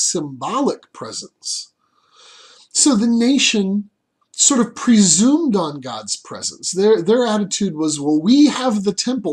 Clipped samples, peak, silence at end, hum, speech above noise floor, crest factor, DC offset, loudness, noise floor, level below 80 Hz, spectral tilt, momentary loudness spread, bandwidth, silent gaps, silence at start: under 0.1%; 0 dBFS; 0 s; none; 37 dB; 18 dB; under 0.1%; -16 LUFS; -54 dBFS; -62 dBFS; -3.5 dB/octave; 13 LU; 12 kHz; none; 0 s